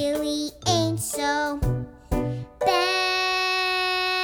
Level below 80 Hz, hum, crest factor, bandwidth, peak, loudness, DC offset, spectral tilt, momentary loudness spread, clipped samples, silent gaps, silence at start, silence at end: -38 dBFS; none; 16 dB; over 20 kHz; -8 dBFS; -24 LUFS; under 0.1%; -3.5 dB/octave; 7 LU; under 0.1%; none; 0 s; 0 s